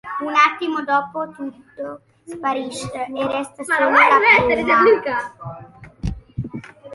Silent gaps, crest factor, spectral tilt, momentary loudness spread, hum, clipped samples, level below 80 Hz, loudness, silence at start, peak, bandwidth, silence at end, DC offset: none; 18 dB; -5 dB/octave; 21 LU; none; under 0.1%; -42 dBFS; -17 LUFS; 0.05 s; 0 dBFS; 11.5 kHz; 0 s; under 0.1%